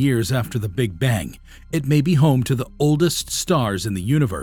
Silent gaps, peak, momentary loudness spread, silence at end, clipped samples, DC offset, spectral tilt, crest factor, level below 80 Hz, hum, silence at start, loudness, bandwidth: none; -6 dBFS; 8 LU; 0 s; under 0.1%; under 0.1%; -6 dB/octave; 12 dB; -42 dBFS; none; 0 s; -20 LUFS; 18.5 kHz